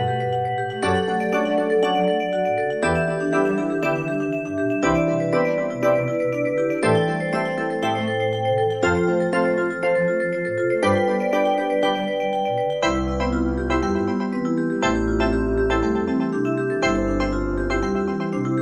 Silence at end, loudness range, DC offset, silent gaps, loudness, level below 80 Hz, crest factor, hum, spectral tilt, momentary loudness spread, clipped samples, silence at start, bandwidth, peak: 0 s; 1 LU; 0.1%; none; -22 LUFS; -36 dBFS; 16 dB; none; -6.5 dB/octave; 4 LU; under 0.1%; 0 s; 12.5 kHz; -6 dBFS